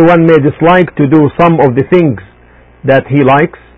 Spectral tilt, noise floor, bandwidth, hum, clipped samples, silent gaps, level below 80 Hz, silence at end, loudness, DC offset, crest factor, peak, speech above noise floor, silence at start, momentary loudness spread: -9.5 dB/octave; -40 dBFS; 5.6 kHz; none; 0.7%; none; -40 dBFS; 0.3 s; -8 LUFS; 0.7%; 8 dB; 0 dBFS; 33 dB; 0 s; 4 LU